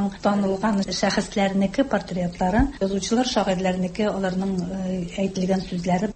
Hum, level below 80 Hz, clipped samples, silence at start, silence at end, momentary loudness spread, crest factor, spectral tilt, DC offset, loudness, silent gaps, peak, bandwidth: none; -40 dBFS; under 0.1%; 0 s; 0 s; 5 LU; 16 dB; -5.5 dB/octave; under 0.1%; -23 LUFS; none; -6 dBFS; 8.8 kHz